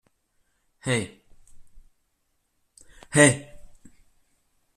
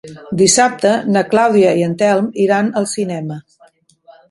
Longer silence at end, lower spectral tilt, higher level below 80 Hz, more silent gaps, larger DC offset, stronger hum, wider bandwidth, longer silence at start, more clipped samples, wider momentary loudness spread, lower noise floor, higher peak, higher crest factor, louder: first, 1.15 s vs 0.9 s; about the same, -4 dB/octave vs -4 dB/octave; about the same, -56 dBFS vs -58 dBFS; neither; neither; neither; first, 14 kHz vs 11.5 kHz; first, 0.85 s vs 0.05 s; neither; first, 18 LU vs 13 LU; first, -73 dBFS vs -50 dBFS; second, -4 dBFS vs 0 dBFS; first, 26 dB vs 14 dB; second, -22 LUFS vs -14 LUFS